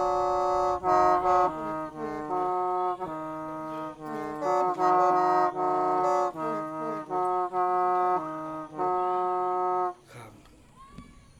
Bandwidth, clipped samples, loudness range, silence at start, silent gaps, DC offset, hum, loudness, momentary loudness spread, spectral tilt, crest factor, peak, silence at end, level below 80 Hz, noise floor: 11.5 kHz; under 0.1%; 4 LU; 0 s; none; under 0.1%; none; -27 LUFS; 13 LU; -6 dB/octave; 18 dB; -10 dBFS; 0.3 s; -58 dBFS; -53 dBFS